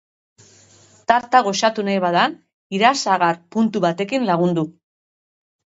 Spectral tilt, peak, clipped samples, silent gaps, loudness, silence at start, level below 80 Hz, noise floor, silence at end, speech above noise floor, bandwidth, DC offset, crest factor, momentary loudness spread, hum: -4.5 dB/octave; 0 dBFS; under 0.1%; 2.53-2.70 s; -19 LUFS; 1.1 s; -66 dBFS; -51 dBFS; 1.1 s; 33 dB; 8 kHz; under 0.1%; 20 dB; 7 LU; none